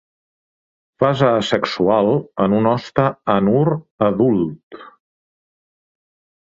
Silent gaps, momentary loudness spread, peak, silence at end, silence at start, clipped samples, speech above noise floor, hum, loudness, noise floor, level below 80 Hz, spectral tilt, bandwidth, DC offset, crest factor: 3.91-3.98 s, 4.63-4.71 s; 5 LU; -2 dBFS; 1.65 s; 1 s; under 0.1%; over 73 dB; none; -17 LUFS; under -90 dBFS; -54 dBFS; -7.5 dB/octave; 7.8 kHz; under 0.1%; 18 dB